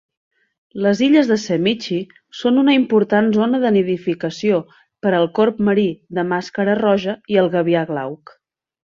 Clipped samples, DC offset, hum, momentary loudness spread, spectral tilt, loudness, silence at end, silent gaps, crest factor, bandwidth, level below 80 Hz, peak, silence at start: under 0.1%; under 0.1%; none; 10 LU; -6.5 dB/octave; -17 LUFS; 0.85 s; none; 16 dB; 7.4 kHz; -60 dBFS; -2 dBFS; 0.75 s